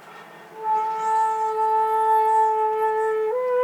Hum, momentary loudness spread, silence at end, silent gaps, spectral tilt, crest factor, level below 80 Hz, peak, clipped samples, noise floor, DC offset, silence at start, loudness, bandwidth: none; 5 LU; 0 s; none; -3 dB/octave; 12 dB; -84 dBFS; -10 dBFS; under 0.1%; -43 dBFS; under 0.1%; 0 s; -21 LUFS; 13 kHz